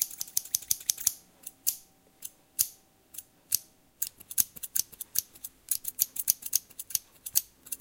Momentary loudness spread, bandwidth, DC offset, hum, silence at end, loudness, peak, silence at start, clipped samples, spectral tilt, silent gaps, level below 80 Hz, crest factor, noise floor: 18 LU; 17.5 kHz; under 0.1%; none; 0.05 s; -30 LUFS; -2 dBFS; 0 s; under 0.1%; 2 dB/octave; none; -68 dBFS; 34 dB; -54 dBFS